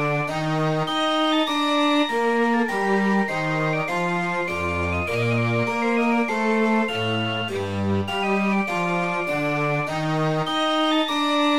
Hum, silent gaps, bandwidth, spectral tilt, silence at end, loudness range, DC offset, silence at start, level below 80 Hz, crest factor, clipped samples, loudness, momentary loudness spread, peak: none; none; 15.5 kHz; -5.5 dB/octave; 0 s; 2 LU; 0.6%; 0 s; -52 dBFS; 12 dB; under 0.1%; -22 LUFS; 4 LU; -10 dBFS